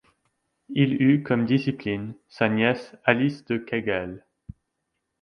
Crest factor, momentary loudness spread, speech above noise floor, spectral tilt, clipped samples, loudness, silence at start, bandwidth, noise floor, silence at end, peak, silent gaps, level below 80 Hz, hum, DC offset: 22 dB; 11 LU; 55 dB; -8 dB/octave; under 0.1%; -24 LUFS; 0.7 s; 6.4 kHz; -79 dBFS; 1.05 s; -2 dBFS; none; -58 dBFS; none; under 0.1%